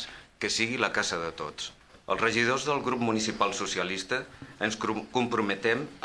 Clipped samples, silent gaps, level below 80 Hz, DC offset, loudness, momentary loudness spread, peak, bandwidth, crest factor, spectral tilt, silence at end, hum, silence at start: under 0.1%; none; -60 dBFS; under 0.1%; -29 LUFS; 10 LU; -8 dBFS; 11 kHz; 22 dB; -3 dB/octave; 0.05 s; none; 0 s